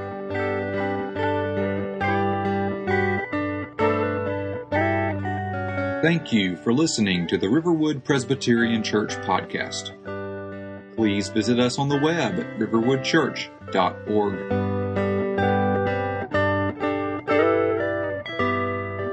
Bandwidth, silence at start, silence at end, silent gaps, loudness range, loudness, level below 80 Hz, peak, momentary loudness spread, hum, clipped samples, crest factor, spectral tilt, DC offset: 9.6 kHz; 0 s; 0 s; none; 3 LU; -24 LUFS; -60 dBFS; -6 dBFS; 7 LU; none; under 0.1%; 18 dB; -5.5 dB/octave; under 0.1%